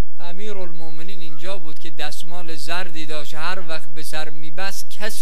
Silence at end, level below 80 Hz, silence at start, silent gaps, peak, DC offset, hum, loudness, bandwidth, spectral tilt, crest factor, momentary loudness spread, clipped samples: 0 s; -64 dBFS; 0.1 s; none; -4 dBFS; 50%; none; -32 LUFS; 16 kHz; -4 dB/octave; 22 dB; 10 LU; under 0.1%